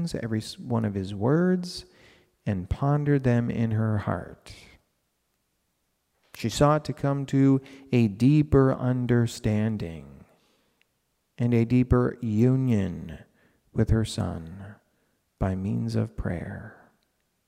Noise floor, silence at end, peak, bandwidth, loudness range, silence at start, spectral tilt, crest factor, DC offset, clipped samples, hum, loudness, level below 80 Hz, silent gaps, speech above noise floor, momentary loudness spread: -75 dBFS; 0.75 s; -8 dBFS; 14 kHz; 7 LU; 0 s; -7.5 dB/octave; 18 dB; under 0.1%; under 0.1%; none; -25 LUFS; -44 dBFS; none; 50 dB; 16 LU